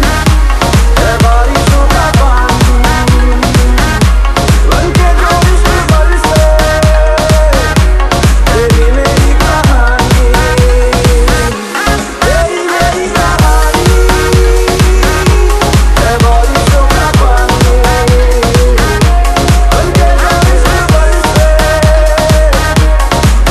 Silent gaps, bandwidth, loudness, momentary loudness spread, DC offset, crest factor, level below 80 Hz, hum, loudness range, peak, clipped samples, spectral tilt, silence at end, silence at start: none; 14 kHz; -8 LUFS; 1 LU; 0.4%; 6 dB; -8 dBFS; none; 1 LU; 0 dBFS; 0.9%; -5 dB/octave; 0 s; 0 s